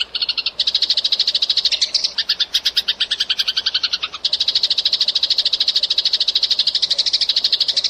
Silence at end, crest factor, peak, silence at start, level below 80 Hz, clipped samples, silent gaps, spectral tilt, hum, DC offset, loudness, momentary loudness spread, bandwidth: 0 s; 14 dB; -4 dBFS; 0 s; -58 dBFS; under 0.1%; none; 2 dB/octave; none; under 0.1%; -15 LUFS; 4 LU; 15.5 kHz